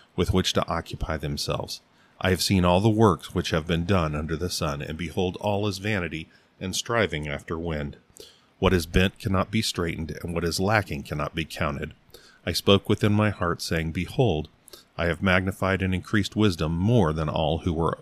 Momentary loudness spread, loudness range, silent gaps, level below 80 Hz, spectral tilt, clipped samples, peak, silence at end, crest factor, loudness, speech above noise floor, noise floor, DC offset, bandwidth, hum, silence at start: 10 LU; 4 LU; none; -42 dBFS; -5.5 dB/octave; under 0.1%; -4 dBFS; 0 s; 22 dB; -25 LUFS; 26 dB; -50 dBFS; under 0.1%; 15.5 kHz; none; 0.15 s